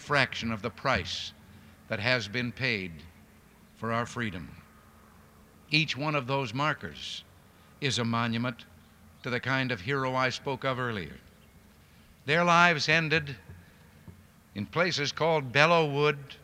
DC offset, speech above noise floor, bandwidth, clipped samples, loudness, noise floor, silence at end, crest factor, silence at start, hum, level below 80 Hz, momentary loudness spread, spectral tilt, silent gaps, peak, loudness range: under 0.1%; 28 dB; 16 kHz; under 0.1%; -28 LUFS; -57 dBFS; 0.1 s; 26 dB; 0 s; none; -60 dBFS; 18 LU; -4.5 dB/octave; none; -4 dBFS; 6 LU